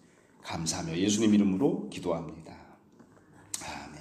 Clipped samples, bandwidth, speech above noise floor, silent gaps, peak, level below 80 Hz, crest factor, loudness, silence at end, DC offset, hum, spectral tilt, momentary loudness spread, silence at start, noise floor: under 0.1%; 14 kHz; 29 dB; none; -14 dBFS; -62 dBFS; 18 dB; -30 LUFS; 0 s; under 0.1%; none; -5 dB/octave; 20 LU; 0.45 s; -58 dBFS